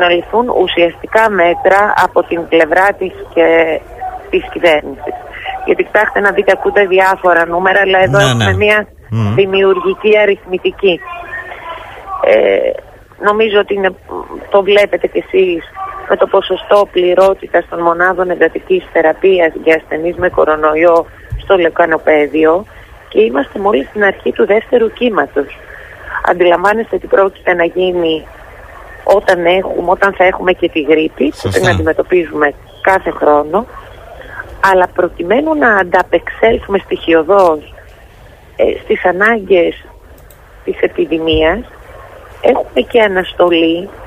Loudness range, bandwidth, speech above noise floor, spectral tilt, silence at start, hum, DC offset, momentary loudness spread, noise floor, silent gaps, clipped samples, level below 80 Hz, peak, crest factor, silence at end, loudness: 3 LU; 15 kHz; 27 dB; -5.5 dB/octave; 0 s; none; under 0.1%; 11 LU; -38 dBFS; none; under 0.1%; -38 dBFS; 0 dBFS; 12 dB; 0 s; -11 LUFS